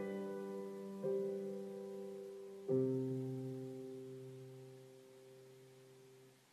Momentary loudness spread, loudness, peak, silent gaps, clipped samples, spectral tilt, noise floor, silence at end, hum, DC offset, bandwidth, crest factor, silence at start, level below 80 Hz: 22 LU; -44 LUFS; -26 dBFS; none; under 0.1%; -8 dB/octave; -64 dBFS; 0.15 s; none; under 0.1%; 14 kHz; 18 dB; 0 s; under -90 dBFS